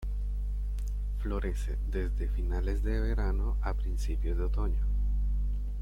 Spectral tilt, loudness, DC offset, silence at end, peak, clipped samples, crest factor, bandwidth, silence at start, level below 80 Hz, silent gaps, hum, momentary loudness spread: -7.5 dB/octave; -34 LUFS; under 0.1%; 0 s; -18 dBFS; under 0.1%; 12 dB; 7 kHz; 0 s; -30 dBFS; none; 50 Hz at -30 dBFS; 5 LU